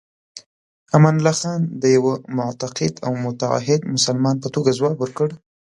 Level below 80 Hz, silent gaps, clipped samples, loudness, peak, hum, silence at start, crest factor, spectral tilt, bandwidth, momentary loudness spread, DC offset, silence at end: -60 dBFS; 0.46-0.86 s; under 0.1%; -19 LUFS; 0 dBFS; none; 0.35 s; 20 dB; -5.5 dB/octave; 11.5 kHz; 9 LU; under 0.1%; 0.4 s